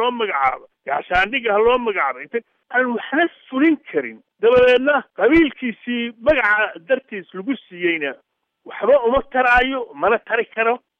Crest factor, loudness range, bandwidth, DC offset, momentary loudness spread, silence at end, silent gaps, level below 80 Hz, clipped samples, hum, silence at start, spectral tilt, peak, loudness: 14 dB; 3 LU; 6.6 kHz; under 0.1%; 12 LU; 0.2 s; none; -46 dBFS; under 0.1%; none; 0 s; -6 dB/octave; -4 dBFS; -18 LUFS